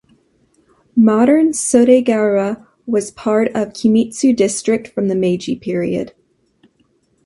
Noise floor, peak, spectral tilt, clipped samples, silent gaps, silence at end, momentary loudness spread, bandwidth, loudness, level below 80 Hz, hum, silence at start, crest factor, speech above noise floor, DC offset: -60 dBFS; 0 dBFS; -5.5 dB/octave; under 0.1%; none; 1.15 s; 10 LU; 11.5 kHz; -15 LUFS; -56 dBFS; none; 0.95 s; 16 dB; 45 dB; under 0.1%